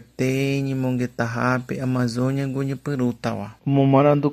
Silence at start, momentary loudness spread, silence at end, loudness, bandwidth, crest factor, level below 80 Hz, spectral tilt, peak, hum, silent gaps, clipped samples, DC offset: 0.2 s; 9 LU; 0 s; -22 LUFS; 14.5 kHz; 18 dB; -58 dBFS; -7.5 dB/octave; -4 dBFS; none; none; under 0.1%; under 0.1%